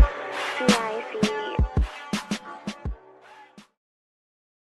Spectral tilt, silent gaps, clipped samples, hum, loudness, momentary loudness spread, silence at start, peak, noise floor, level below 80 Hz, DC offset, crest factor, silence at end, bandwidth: -5 dB/octave; none; under 0.1%; none; -27 LUFS; 15 LU; 0 s; -6 dBFS; -50 dBFS; -32 dBFS; under 0.1%; 22 dB; 1.05 s; 12.5 kHz